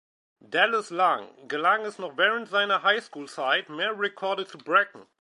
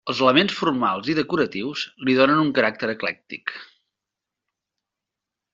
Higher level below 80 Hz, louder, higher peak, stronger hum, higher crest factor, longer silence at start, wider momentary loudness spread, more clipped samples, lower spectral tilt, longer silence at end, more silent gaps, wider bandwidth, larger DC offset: second, -86 dBFS vs -64 dBFS; second, -25 LUFS vs -21 LUFS; about the same, -6 dBFS vs -4 dBFS; neither; about the same, 20 dB vs 20 dB; first, 0.5 s vs 0.05 s; second, 9 LU vs 14 LU; neither; about the same, -3 dB/octave vs -3 dB/octave; second, 0.2 s vs 1.9 s; neither; first, 11.5 kHz vs 7.6 kHz; neither